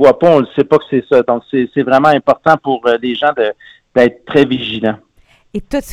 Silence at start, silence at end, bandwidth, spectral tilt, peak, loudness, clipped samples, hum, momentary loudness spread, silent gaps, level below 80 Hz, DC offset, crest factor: 0 s; 0 s; 13 kHz; -6.5 dB/octave; 0 dBFS; -13 LUFS; 0.4%; none; 10 LU; none; -44 dBFS; under 0.1%; 12 dB